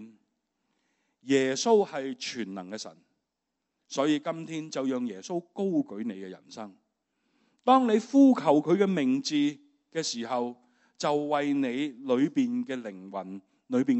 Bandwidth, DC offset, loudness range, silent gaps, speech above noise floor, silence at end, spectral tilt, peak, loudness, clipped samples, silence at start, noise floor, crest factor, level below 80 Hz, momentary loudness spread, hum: 8.2 kHz; under 0.1%; 8 LU; none; 57 dB; 0 s; -5 dB/octave; -8 dBFS; -28 LUFS; under 0.1%; 0 s; -84 dBFS; 20 dB; -84 dBFS; 16 LU; none